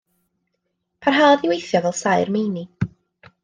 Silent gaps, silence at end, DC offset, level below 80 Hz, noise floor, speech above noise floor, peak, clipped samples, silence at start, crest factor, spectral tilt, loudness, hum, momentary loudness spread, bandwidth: none; 0.55 s; under 0.1%; -58 dBFS; -75 dBFS; 57 dB; -4 dBFS; under 0.1%; 1 s; 18 dB; -5 dB/octave; -19 LUFS; none; 14 LU; 10 kHz